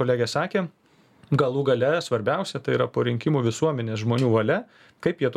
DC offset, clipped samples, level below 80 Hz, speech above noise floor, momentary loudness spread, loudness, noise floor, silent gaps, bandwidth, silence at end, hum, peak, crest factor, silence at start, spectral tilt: under 0.1%; under 0.1%; -64 dBFS; 33 dB; 6 LU; -24 LUFS; -56 dBFS; none; 12.5 kHz; 0 s; none; -6 dBFS; 16 dB; 0 s; -6.5 dB/octave